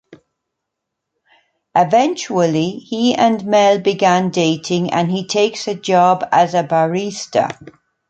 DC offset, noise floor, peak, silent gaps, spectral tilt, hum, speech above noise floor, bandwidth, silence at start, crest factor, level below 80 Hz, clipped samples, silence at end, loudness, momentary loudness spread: under 0.1%; -78 dBFS; -2 dBFS; none; -5 dB/octave; none; 63 dB; 9 kHz; 0.1 s; 16 dB; -62 dBFS; under 0.1%; 0.4 s; -16 LUFS; 6 LU